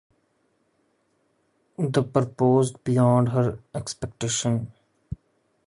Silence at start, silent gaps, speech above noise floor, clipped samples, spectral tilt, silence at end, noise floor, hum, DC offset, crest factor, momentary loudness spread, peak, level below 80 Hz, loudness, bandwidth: 1.8 s; none; 46 dB; under 0.1%; -6 dB/octave; 0.5 s; -69 dBFS; none; under 0.1%; 20 dB; 20 LU; -6 dBFS; -54 dBFS; -24 LUFS; 11.5 kHz